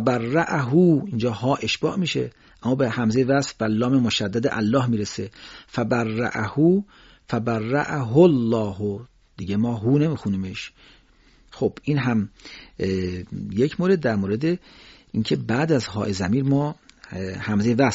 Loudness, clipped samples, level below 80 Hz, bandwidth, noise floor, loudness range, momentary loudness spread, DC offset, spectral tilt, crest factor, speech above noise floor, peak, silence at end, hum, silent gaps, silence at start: -23 LUFS; under 0.1%; -54 dBFS; 8 kHz; -55 dBFS; 4 LU; 13 LU; under 0.1%; -6 dB/octave; 18 dB; 33 dB; -4 dBFS; 0 s; none; none; 0 s